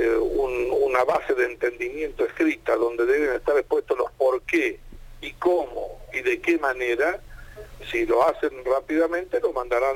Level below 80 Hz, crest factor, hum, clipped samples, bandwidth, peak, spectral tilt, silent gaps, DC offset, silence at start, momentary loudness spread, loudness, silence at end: -46 dBFS; 18 dB; none; under 0.1%; 16.5 kHz; -6 dBFS; -5 dB/octave; none; under 0.1%; 0 s; 9 LU; -24 LUFS; 0 s